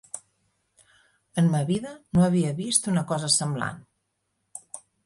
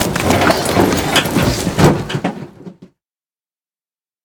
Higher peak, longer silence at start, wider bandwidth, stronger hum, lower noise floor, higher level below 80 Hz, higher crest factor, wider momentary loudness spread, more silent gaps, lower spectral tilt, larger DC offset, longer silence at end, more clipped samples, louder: second, -8 dBFS vs 0 dBFS; first, 0.15 s vs 0 s; second, 11.5 kHz vs over 20 kHz; neither; second, -76 dBFS vs under -90 dBFS; second, -58 dBFS vs -34 dBFS; about the same, 20 dB vs 16 dB; first, 20 LU vs 10 LU; neither; about the same, -4.5 dB/octave vs -4.5 dB/octave; neither; second, 0.3 s vs 1.4 s; neither; second, -24 LUFS vs -14 LUFS